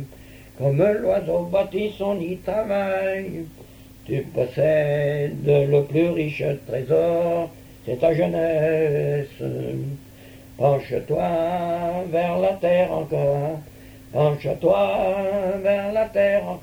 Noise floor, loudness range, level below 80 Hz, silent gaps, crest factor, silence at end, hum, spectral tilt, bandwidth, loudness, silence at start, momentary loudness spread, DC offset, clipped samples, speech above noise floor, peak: -44 dBFS; 3 LU; -50 dBFS; none; 16 dB; 0 s; none; -8 dB/octave; over 20 kHz; -22 LUFS; 0 s; 10 LU; under 0.1%; under 0.1%; 22 dB; -6 dBFS